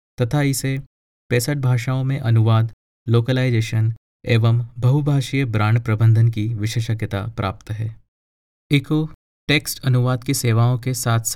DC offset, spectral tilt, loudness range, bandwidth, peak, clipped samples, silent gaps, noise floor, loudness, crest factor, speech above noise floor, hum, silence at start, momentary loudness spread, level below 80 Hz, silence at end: under 0.1%; -6 dB/octave; 4 LU; 16 kHz; -4 dBFS; under 0.1%; 0.86-1.30 s, 2.73-3.06 s, 3.97-4.20 s, 8.08-8.70 s, 9.14-9.47 s; under -90 dBFS; -20 LUFS; 16 dB; over 72 dB; none; 0.2 s; 9 LU; -48 dBFS; 0 s